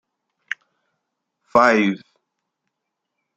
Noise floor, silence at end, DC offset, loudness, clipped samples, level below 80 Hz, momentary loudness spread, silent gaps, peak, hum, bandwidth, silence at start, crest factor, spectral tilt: -80 dBFS; 1.4 s; under 0.1%; -17 LUFS; under 0.1%; -64 dBFS; 17 LU; none; -2 dBFS; none; 9 kHz; 1.55 s; 22 dB; -5.5 dB/octave